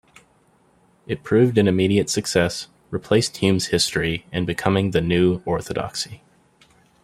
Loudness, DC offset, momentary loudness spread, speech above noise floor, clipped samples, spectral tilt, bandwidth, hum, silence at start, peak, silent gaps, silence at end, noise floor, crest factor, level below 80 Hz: -21 LUFS; under 0.1%; 13 LU; 39 dB; under 0.1%; -5 dB/octave; 16 kHz; none; 1.1 s; -2 dBFS; none; 0.9 s; -59 dBFS; 18 dB; -50 dBFS